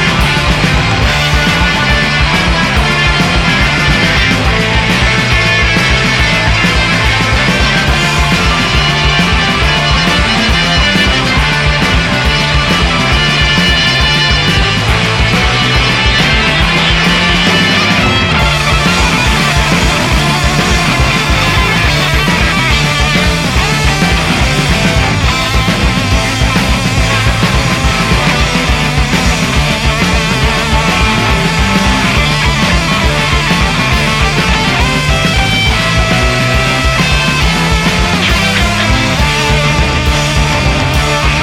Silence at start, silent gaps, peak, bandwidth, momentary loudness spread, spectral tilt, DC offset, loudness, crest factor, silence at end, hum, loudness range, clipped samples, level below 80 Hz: 0 s; none; 0 dBFS; 16 kHz; 2 LU; -4 dB/octave; under 0.1%; -9 LUFS; 10 dB; 0 s; none; 2 LU; under 0.1%; -18 dBFS